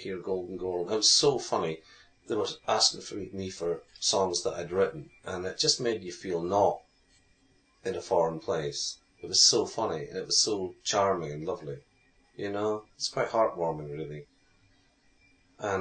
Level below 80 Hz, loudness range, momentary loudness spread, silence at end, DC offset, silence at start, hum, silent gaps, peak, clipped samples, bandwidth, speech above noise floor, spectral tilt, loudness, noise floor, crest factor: -64 dBFS; 6 LU; 16 LU; 0 s; under 0.1%; 0 s; none; none; -10 dBFS; under 0.1%; 9.4 kHz; 36 dB; -2.5 dB/octave; -28 LUFS; -66 dBFS; 22 dB